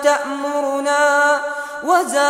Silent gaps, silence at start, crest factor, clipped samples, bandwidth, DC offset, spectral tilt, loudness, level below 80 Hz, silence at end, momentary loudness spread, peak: none; 0 s; 14 dB; under 0.1%; 16 kHz; under 0.1%; -0.5 dB/octave; -17 LUFS; -64 dBFS; 0 s; 9 LU; -4 dBFS